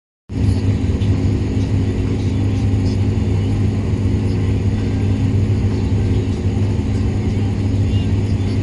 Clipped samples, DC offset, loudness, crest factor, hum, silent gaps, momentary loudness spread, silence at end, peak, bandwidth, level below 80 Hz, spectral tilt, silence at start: under 0.1%; under 0.1%; -18 LUFS; 12 dB; none; none; 2 LU; 0 s; -4 dBFS; 10.5 kHz; -24 dBFS; -8 dB/octave; 0.3 s